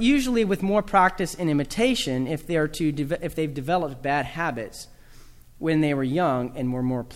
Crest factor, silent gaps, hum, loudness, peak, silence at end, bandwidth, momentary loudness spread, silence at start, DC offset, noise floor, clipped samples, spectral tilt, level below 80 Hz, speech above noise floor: 18 dB; none; none; -24 LUFS; -6 dBFS; 0 s; 16 kHz; 8 LU; 0 s; under 0.1%; -47 dBFS; under 0.1%; -5.5 dB/octave; -44 dBFS; 23 dB